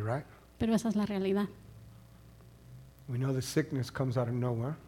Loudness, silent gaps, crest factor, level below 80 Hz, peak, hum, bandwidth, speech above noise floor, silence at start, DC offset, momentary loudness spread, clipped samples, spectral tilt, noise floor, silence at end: -33 LUFS; none; 18 dB; -60 dBFS; -16 dBFS; none; 17 kHz; 23 dB; 0 s; under 0.1%; 23 LU; under 0.1%; -6.5 dB/octave; -55 dBFS; 0 s